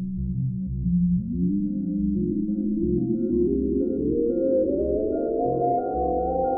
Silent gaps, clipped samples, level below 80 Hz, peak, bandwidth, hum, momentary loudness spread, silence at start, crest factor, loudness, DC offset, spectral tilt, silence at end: none; under 0.1%; -38 dBFS; -12 dBFS; 1.5 kHz; none; 4 LU; 0 s; 12 dB; -25 LUFS; under 0.1%; -17 dB/octave; 0 s